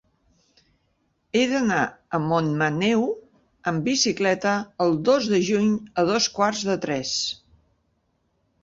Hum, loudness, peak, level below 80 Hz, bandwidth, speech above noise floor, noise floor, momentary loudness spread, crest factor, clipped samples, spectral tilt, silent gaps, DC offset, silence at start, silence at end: none; -23 LUFS; -8 dBFS; -60 dBFS; 7.8 kHz; 48 dB; -70 dBFS; 7 LU; 16 dB; under 0.1%; -4 dB/octave; none; under 0.1%; 1.35 s; 1.25 s